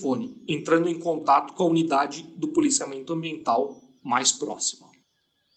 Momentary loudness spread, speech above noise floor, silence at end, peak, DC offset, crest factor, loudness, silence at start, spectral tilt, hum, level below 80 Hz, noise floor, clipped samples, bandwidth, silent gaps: 9 LU; 47 dB; 0.8 s; -6 dBFS; under 0.1%; 20 dB; -25 LUFS; 0 s; -3.5 dB/octave; none; -72 dBFS; -72 dBFS; under 0.1%; 9.4 kHz; none